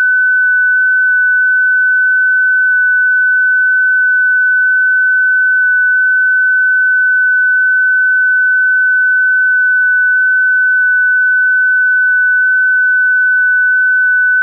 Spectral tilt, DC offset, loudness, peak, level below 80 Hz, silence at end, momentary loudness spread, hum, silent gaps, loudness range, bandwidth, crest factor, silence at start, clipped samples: 2 dB/octave; under 0.1%; -9 LUFS; -6 dBFS; under -90 dBFS; 0 s; 0 LU; none; none; 0 LU; 1.7 kHz; 4 dB; 0 s; under 0.1%